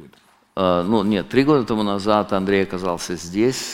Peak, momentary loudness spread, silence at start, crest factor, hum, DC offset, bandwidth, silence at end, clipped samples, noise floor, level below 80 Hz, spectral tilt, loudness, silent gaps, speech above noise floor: -2 dBFS; 7 LU; 0 s; 18 dB; none; under 0.1%; 17 kHz; 0 s; under 0.1%; -53 dBFS; -48 dBFS; -5.5 dB/octave; -20 LUFS; none; 34 dB